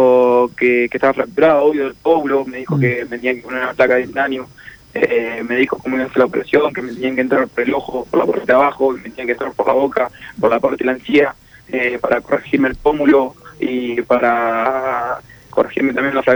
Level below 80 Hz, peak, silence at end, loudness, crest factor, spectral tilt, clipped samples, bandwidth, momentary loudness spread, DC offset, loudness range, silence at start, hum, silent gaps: -48 dBFS; -2 dBFS; 0 s; -16 LUFS; 14 dB; -7 dB/octave; under 0.1%; over 20 kHz; 8 LU; under 0.1%; 2 LU; 0 s; none; none